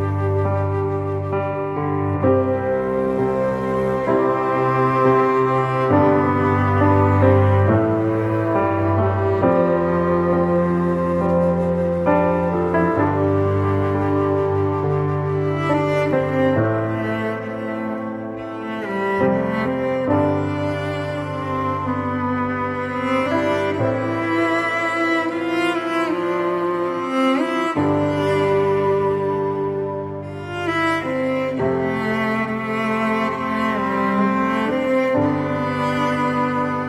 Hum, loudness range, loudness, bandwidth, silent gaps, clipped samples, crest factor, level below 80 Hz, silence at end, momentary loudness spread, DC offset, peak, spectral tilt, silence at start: none; 5 LU; -20 LUFS; 11 kHz; none; under 0.1%; 18 dB; -48 dBFS; 0 s; 7 LU; under 0.1%; -2 dBFS; -8 dB/octave; 0 s